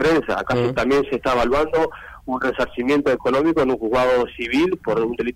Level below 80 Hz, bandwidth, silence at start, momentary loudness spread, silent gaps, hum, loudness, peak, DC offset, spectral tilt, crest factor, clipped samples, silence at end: -42 dBFS; 15.5 kHz; 0 s; 5 LU; none; none; -20 LUFS; -8 dBFS; under 0.1%; -6 dB/octave; 10 dB; under 0.1%; 0 s